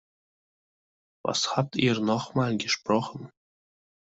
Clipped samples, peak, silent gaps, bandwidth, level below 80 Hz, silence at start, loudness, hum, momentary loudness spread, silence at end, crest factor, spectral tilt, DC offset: under 0.1%; -8 dBFS; none; 8.2 kHz; -66 dBFS; 1.25 s; -27 LUFS; none; 9 LU; 0.9 s; 22 dB; -4.5 dB/octave; under 0.1%